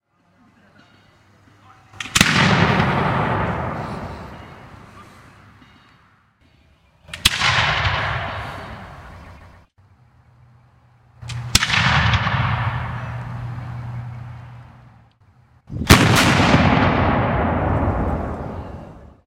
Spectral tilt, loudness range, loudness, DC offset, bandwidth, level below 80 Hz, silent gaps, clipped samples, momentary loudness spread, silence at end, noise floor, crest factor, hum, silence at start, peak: -4.5 dB/octave; 14 LU; -18 LUFS; under 0.1%; 16 kHz; -34 dBFS; none; under 0.1%; 23 LU; 0.2 s; -57 dBFS; 22 dB; none; 1.95 s; 0 dBFS